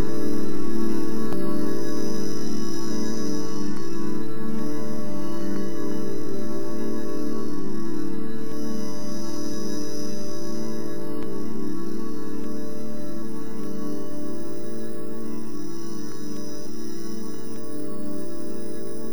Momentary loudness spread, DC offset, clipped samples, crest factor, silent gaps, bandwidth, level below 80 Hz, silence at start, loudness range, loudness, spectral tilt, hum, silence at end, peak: 7 LU; 20%; under 0.1%; 12 dB; none; over 20 kHz; -64 dBFS; 0 s; 6 LU; -31 LUFS; -6 dB/octave; none; 0 s; -8 dBFS